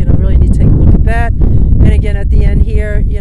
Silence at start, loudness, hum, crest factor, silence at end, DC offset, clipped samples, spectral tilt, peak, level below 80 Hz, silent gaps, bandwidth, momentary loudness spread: 0 s; -11 LUFS; none; 6 dB; 0 s; under 0.1%; 2%; -9.5 dB/octave; 0 dBFS; -8 dBFS; none; 4.4 kHz; 4 LU